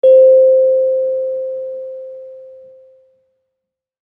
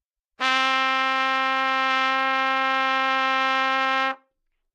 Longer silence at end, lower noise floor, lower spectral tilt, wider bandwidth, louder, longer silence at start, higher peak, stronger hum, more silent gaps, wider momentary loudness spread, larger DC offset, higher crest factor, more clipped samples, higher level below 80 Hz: first, 1.65 s vs 0.6 s; first, -79 dBFS vs -74 dBFS; first, -7 dB/octave vs 0 dB/octave; second, 3.5 kHz vs 11.5 kHz; first, -12 LUFS vs -21 LUFS; second, 0.05 s vs 0.4 s; first, -2 dBFS vs -6 dBFS; neither; neither; first, 24 LU vs 2 LU; neither; second, 12 dB vs 18 dB; neither; first, -74 dBFS vs -84 dBFS